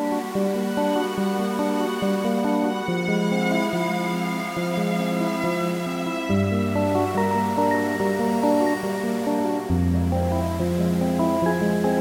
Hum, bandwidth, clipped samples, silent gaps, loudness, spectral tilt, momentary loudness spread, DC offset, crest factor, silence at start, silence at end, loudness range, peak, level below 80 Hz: none; 17 kHz; under 0.1%; none; -23 LUFS; -6.5 dB/octave; 4 LU; under 0.1%; 14 dB; 0 s; 0 s; 2 LU; -8 dBFS; -50 dBFS